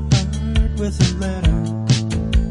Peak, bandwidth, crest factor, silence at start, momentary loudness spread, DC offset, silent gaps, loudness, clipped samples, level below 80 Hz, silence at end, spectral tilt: -2 dBFS; 11 kHz; 16 dB; 0 s; 2 LU; under 0.1%; none; -19 LUFS; under 0.1%; -22 dBFS; 0 s; -5.5 dB/octave